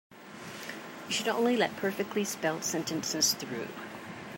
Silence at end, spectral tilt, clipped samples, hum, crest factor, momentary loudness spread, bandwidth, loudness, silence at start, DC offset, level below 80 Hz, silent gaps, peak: 0 s; -2.5 dB/octave; under 0.1%; none; 22 dB; 16 LU; 16 kHz; -31 LUFS; 0.1 s; under 0.1%; -74 dBFS; none; -12 dBFS